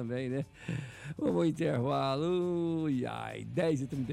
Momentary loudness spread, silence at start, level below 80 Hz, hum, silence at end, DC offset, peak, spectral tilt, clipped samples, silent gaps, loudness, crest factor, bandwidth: 9 LU; 0 s; -62 dBFS; none; 0 s; under 0.1%; -20 dBFS; -7.5 dB/octave; under 0.1%; none; -33 LUFS; 12 dB; 12 kHz